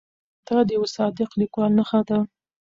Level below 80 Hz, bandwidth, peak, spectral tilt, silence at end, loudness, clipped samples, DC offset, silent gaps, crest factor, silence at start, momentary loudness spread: -62 dBFS; 7.6 kHz; -8 dBFS; -7 dB/octave; 0.35 s; -22 LUFS; under 0.1%; under 0.1%; none; 14 dB; 0.5 s; 5 LU